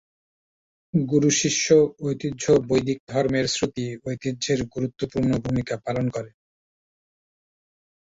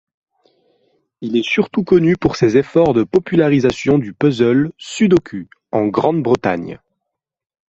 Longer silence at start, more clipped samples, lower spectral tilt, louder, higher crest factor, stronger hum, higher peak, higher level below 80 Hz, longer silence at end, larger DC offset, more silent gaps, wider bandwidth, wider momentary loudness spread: second, 0.95 s vs 1.2 s; neither; second, -5 dB/octave vs -7 dB/octave; second, -23 LUFS vs -15 LUFS; about the same, 18 dB vs 14 dB; neither; second, -6 dBFS vs -2 dBFS; about the same, -52 dBFS vs -48 dBFS; first, 1.8 s vs 1 s; neither; first, 3.00-3.07 s vs none; about the same, 8 kHz vs 8.2 kHz; about the same, 11 LU vs 9 LU